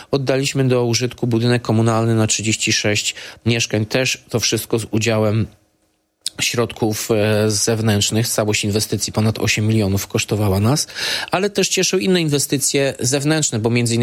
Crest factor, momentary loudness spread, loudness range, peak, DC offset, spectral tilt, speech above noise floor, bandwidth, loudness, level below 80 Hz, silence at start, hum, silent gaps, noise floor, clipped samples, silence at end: 16 dB; 4 LU; 2 LU; -2 dBFS; under 0.1%; -4 dB/octave; 47 dB; 16.5 kHz; -17 LUFS; -50 dBFS; 0 s; none; none; -64 dBFS; under 0.1%; 0 s